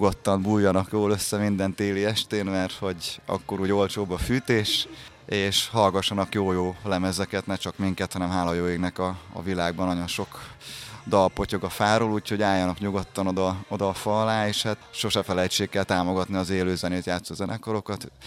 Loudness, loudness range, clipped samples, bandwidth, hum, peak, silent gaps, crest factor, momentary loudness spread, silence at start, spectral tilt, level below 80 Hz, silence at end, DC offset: -26 LUFS; 3 LU; under 0.1%; 16 kHz; none; -6 dBFS; none; 20 dB; 8 LU; 0 s; -5 dB/octave; -48 dBFS; 0 s; under 0.1%